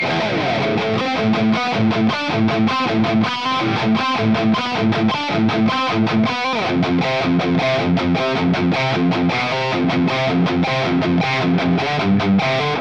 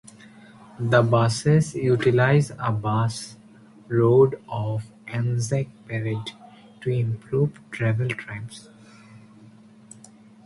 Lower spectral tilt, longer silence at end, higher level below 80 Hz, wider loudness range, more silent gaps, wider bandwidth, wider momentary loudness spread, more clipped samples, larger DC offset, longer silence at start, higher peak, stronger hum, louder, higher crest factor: about the same, -6.5 dB/octave vs -6.5 dB/octave; second, 0 s vs 1.3 s; first, -50 dBFS vs -56 dBFS; second, 0 LU vs 7 LU; neither; second, 8.2 kHz vs 11.5 kHz; second, 2 LU vs 14 LU; neither; first, 0.4% vs under 0.1%; second, 0 s vs 0.8 s; about the same, -6 dBFS vs -6 dBFS; neither; first, -17 LUFS vs -23 LUFS; second, 12 dB vs 18 dB